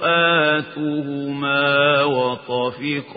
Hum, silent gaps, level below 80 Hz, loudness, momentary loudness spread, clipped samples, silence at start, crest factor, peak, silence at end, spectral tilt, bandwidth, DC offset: none; none; -66 dBFS; -19 LUFS; 9 LU; under 0.1%; 0 s; 16 dB; -4 dBFS; 0 s; -10 dB/octave; 5 kHz; under 0.1%